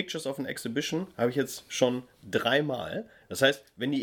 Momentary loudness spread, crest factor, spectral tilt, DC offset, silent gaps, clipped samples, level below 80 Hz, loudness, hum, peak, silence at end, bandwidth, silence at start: 10 LU; 22 dB; -4 dB/octave; under 0.1%; none; under 0.1%; -68 dBFS; -30 LUFS; none; -8 dBFS; 0 s; 19 kHz; 0 s